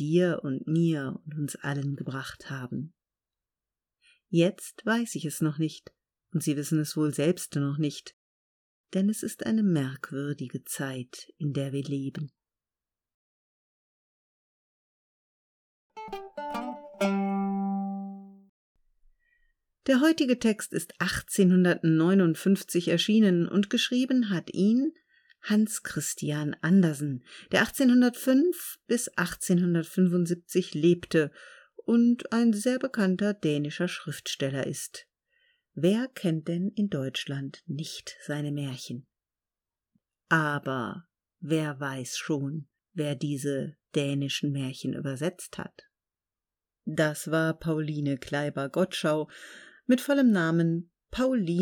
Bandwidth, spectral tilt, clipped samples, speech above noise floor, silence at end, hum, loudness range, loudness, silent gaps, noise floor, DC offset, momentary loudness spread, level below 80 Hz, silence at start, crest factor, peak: 19 kHz; -5.5 dB/octave; under 0.1%; over 63 dB; 0 s; none; 10 LU; -28 LUFS; 8.13-8.84 s, 13.14-15.90 s, 18.49-18.75 s; under -90 dBFS; under 0.1%; 15 LU; -64 dBFS; 0 s; 20 dB; -8 dBFS